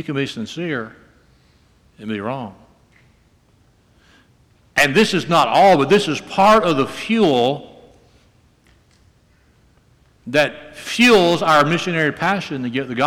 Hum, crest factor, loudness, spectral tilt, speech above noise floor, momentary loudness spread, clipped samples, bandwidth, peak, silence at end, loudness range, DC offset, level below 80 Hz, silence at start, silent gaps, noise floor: none; 14 dB; -16 LUFS; -4.5 dB/octave; 39 dB; 15 LU; under 0.1%; 19.5 kHz; -4 dBFS; 0 s; 16 LU; under 0.1%; -52 dBFS; 0 s; none; -56 dBFS